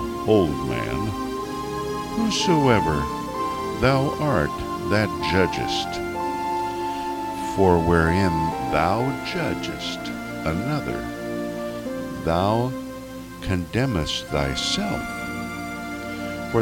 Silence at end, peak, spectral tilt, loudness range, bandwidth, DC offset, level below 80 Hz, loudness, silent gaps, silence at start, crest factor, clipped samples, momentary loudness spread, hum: 0 s; -4 dBFS; -5.5 dB/octave; 4 LU; 17 kHz; under 0.1%; -40 dBFS; -24 LUFS; none; 0 s; 20 dB; under 0.1%; 11 LU; 60 Hz at -50 dBFS